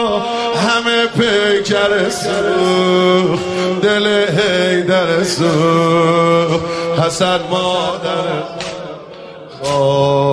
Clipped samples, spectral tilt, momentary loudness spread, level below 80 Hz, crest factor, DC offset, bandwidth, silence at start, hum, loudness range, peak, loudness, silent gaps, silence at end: under 0.1%; -5 dB/octave; 10 LU; -50 dBFS; 12 dB; under 0.1%; 11 kHz; 0 s; none; 4 LU; -2 dBFS; -14 LUFS; none; 0 s